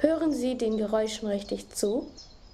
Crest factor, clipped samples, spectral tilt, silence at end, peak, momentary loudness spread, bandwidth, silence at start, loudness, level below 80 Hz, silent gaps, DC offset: 20 dB; under 0.1%; -4.5 dB/octave; 0.05 s; -8 dBFS; 7 LU; 15.5 kHz; 0 s; -29 LUFS; -54 dBFS; none; under 0.1%